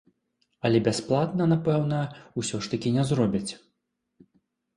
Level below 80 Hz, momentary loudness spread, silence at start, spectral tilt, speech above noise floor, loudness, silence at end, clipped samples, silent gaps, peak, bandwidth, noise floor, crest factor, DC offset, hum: -58 dBFS; 9 LU; 0.65 s; -6.5 dB/octave; 54 dB; -26 LUFS; 1.2 s; under 0.1%; none; -10 dBFS; 11 kHz; -79 dBFS; 18 dB; under 0.1%; none